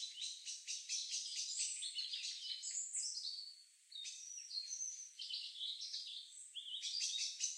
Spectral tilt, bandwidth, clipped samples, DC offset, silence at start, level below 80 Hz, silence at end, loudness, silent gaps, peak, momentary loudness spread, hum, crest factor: 10.5 dB/octave; 15 kHz; under 0.1%; under 0.1%; 0 s; under -90 dBFS; 0 s; -43 LUFS; none; -24 dBFS; 9 LU; none; 22 dB